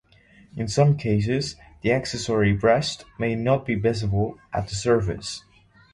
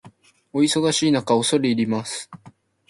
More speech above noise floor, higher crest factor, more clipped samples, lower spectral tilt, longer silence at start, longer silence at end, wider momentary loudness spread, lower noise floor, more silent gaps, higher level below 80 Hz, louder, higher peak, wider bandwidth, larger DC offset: about the same, 31 dB vs 30 dB; about the same, 18 dB vs 16 dB; neither; first, -6 dB/octave vs -4 dB/octave; first, 0.55 s vs 0.05 s; first, 0.55 s vs 0.4 s; about the same, 12 LU vs 12 LU; first, -54 dBFS vs -50 dBFS; neither; first, -44 dBFS vs -62 dBFS; second, -24 LUFS vs -20 LUFS; about the same, -6 dBFS vs -6 dBFS; about the same, 11.5 kHz vs 11.5 kHz; neither